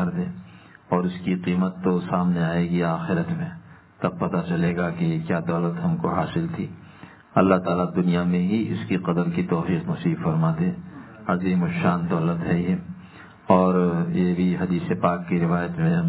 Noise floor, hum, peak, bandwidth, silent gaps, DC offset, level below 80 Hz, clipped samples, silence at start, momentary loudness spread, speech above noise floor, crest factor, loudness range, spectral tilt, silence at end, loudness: -46 dBFS; none; -2 dBFS; 4 kHz; none; under 0.1%; -50 dBFS; under 0.1%; 0 s; 8 LU; 24 dB; 20 dB; 3 LU; -12 dB/octave; 0 s; -23 LUFS